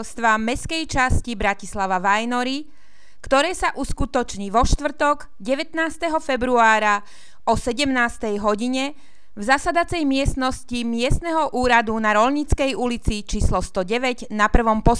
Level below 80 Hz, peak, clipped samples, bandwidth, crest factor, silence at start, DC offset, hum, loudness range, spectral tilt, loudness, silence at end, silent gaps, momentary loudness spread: -30 dBFS; -2 dBFS; under 0.1%; 11 kHz; 20 dB; 0 s; 2%; none; 2 LU; -4.5 dB/octave; -21 LUFS; 0 s; none; 8 LU